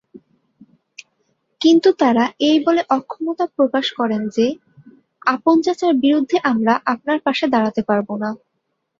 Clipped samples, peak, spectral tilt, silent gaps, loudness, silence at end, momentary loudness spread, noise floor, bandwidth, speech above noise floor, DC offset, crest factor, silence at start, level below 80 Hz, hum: under 0.1%; -2 dBFS; -5 dB/octave; none; -17 LUFS; 0.65 s; 8 LU; -73 dBFS; 7.4 kHz; 56 dB; under 0.1%; 16 dB; 1 s; -64 dBFS; none